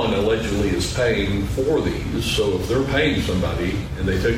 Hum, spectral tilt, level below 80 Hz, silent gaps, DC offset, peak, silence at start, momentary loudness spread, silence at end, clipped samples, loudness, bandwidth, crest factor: none; -5.5 dB/octave; -32 dBFS; none; under 0.1%; -8 dBFS; 0 s; 5 LU; 0 s; under 0.1%; -21 LUFS; 16 kHz; 14 dB